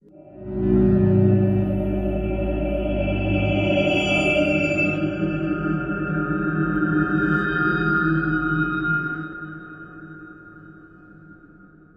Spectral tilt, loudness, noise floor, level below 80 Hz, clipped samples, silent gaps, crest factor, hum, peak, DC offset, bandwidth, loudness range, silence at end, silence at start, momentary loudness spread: -7.5 dB/octave; -21 LUFS; -49 dBFS; -36 dBFS; under 0.1%; none; 16 dB; none; -6 dBFS; under 0.1%; 9.6 kHz; 5 LU; 0.65 s; 0.15 s; 17 LU